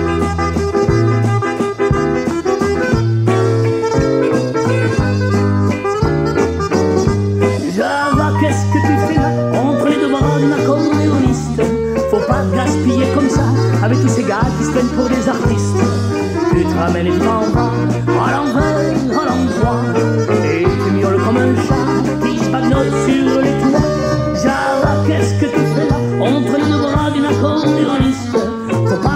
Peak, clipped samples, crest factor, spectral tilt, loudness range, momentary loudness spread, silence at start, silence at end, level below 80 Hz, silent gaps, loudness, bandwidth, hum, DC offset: 0 dBFS; under 0.1%; 14 dB; -7 dB/octave; 1 LU; 3 LU; 0 s; 0 s; -32 dBFS; none; -14 LUFS; 14 kHz; none; under 0.1%